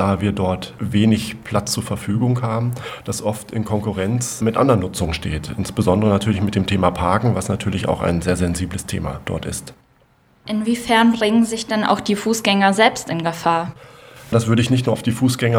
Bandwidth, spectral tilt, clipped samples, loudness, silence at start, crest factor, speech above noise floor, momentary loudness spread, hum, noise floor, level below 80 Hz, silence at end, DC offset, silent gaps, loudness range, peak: 16.5 kHz; -5.5 dB/octave; under 0.1%; -19 LUFS; 0 s; 18 dB; 37 dB; 10 LU; none; -56 dBFS; -40 dBFS; 0 s; under 0.1%; none; 5 LU; 0 dBFS